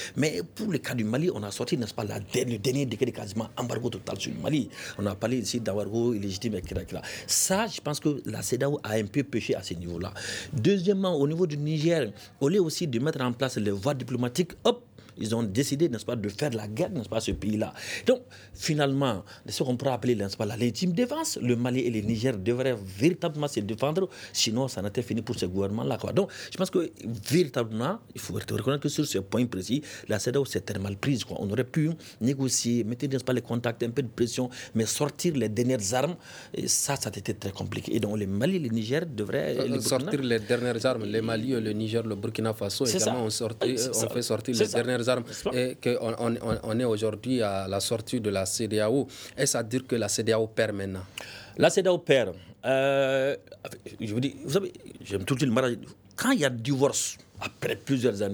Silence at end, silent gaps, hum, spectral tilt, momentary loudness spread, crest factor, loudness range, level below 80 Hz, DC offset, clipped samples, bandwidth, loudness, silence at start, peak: 0 s; none; none; -4.5 dB/octave; 8 LU; 22 dB; 3 LU; -58 dBFS; under 0.1%; under 0.1%; over 20 kHz; -28 LUFS; 0 s; -6 dBFS